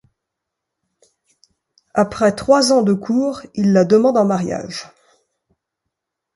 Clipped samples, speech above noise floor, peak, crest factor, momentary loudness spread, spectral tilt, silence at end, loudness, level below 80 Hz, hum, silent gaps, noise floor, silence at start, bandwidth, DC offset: under 0.1%; 65 dB; -2 dBFS; 18 dB; 11 LU; -5.5 dB/octave; 1.5 s; -16 LUFS; -54 dBFS; none; none; -80 dBFS; 1.95 s; 11.5 kHz; under 0.1%